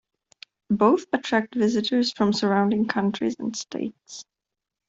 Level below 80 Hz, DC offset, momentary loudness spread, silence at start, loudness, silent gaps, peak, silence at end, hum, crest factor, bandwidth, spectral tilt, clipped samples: -64 dBFS; under 0.1%; 13 LU; 0.7 s; -24 LUFS; none; -6 dBFS; 0.65 s; none; 20 dB; 7.8 kHz; -5 dB/octave; under 0.1%